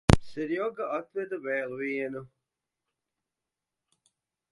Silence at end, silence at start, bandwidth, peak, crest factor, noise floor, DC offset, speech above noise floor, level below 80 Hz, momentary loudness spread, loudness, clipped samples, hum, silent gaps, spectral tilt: 2.25 s; 0.1 s; 11.5 kHz; 0 dBFS; 32 dB; -88 dBFS; under 0.1%; 56 dB; -42 dBFS; 9 LU; -31 LUFS; under 0.1%; none; none; -6.5 dB/octave